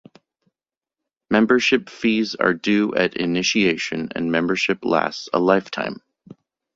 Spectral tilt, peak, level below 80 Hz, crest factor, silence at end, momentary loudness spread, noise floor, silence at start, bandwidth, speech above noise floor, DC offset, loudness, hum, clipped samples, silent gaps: -4.5 dB/octave; -2 dBFS; -58 dBFS; 20 dB; 0.8 s; 8 LU; -89 dBFS; 1.3 s; 7.8 kHz; 69 dB; under 0.1%; -20 LUFS; none; under 0.1%; none